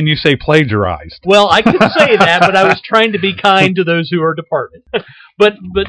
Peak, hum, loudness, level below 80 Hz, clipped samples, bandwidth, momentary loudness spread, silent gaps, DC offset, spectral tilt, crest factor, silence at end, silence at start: 0 dBFS; none; -11 LUFS; -40 dBFS; 1%; 11 kHz; 11 LU; none; under 0.1%; -5.5 dB/octave; 12 dB; 0 s; 0 s